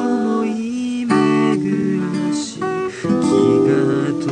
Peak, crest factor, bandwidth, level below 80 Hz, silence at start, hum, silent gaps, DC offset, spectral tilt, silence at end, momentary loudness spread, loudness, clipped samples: -2 dBFS; 16 dB; 10 kHz; -56 dBFS; 0 s; none; none; under 0.1%; -6.5 dB/octave; 0 s; 8 LU; -18 LUFS; under 0.1%